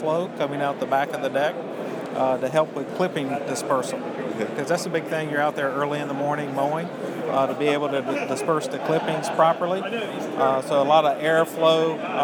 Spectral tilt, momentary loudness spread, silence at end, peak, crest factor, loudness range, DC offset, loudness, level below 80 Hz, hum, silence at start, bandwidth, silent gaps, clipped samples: -5 dB/octave; 9 LU; 0 s; -6 dBFS; 18 dB; 4 LU; under 0.1%; -24 LUFS; -80 dBFS; none; 0 s; 19.5 kHz; none; under 0.1%